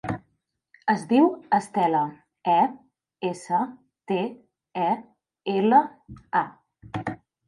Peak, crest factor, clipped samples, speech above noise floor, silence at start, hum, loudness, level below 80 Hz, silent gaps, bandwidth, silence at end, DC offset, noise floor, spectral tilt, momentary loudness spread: -6 dBFS; 20 dB; under 0.1%; 50 dB; 0.05 s; none; -25 LUFS; -62 dBFS; none; 11.5 kHz; 0.35 s; under 0.1%; -73 dBFS; -6.5 dB/octave; 15 LU